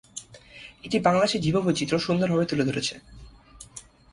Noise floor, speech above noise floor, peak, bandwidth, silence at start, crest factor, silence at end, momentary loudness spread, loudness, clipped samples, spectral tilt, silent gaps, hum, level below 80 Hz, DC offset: -49 dBFS; 25 dB; -8 dBFS; 11.5 kHz; 0.15 s; 20 dB; 0.35 s; 22 LU; -24 LUFS; under 0.1%; -5 dB/octave; none; none; -54 dBFS; under 0.1%